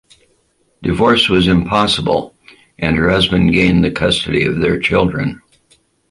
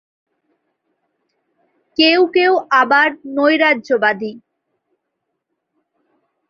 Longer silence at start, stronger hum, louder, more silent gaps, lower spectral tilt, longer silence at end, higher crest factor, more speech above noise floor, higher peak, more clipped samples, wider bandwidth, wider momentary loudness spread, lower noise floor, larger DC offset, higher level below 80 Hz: second, 0.8 s vs 2 s; neither; about the same, -14 LUFS vs -14 LUFS; neither; first, -6 dB/octave vs -4.5 dB/octave; second, 0.75 s vs 2.1 s; about the same, 14 dB vs 18 dB; second, 46 dB vs 61 dB; about the same, 0 dBFS vs 0 dBFS; neither; first, 11.5 kHz vs 7 kHz; about the same, 10 LU vs 9 LU; second, -59 dBFS vs -75 dBFS; neither; first, -34 dBFS vs -66 dBFS